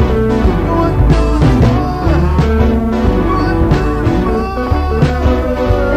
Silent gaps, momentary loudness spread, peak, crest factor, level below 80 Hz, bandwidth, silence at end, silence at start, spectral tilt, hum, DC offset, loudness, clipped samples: none; 3 LU; 0 dBFS; 10 dB; -16 dBFS; 9.4 kHz; 0 s; 0 s; -8 dB/octave; none; under 0.1%; -13 LUFS; under 0.1%